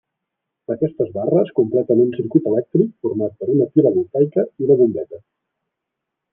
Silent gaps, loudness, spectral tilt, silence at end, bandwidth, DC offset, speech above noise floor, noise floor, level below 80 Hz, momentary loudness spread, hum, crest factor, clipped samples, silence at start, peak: none; -18 LUFS; -12.5 dB/octave; 1.15 s; 3.5 kHz; under 0.1%; 63 dB; -80 dBFS; -66 dBFS; 8 LU; none; 16 dB; under 0.1%; 0.7 s; -2 dBFS